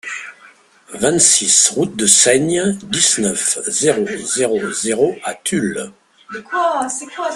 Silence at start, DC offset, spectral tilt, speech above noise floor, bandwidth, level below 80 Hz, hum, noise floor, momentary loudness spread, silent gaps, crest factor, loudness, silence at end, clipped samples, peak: 0.05 s; under 0.1%; -2 dB/octave; 30 dB; 15 kHz; -56 dBFS; none; -47 dBFS; 18 LU; none; 18 dB; -14 LUFS; 0 s; under 0.1%; 0 dBFS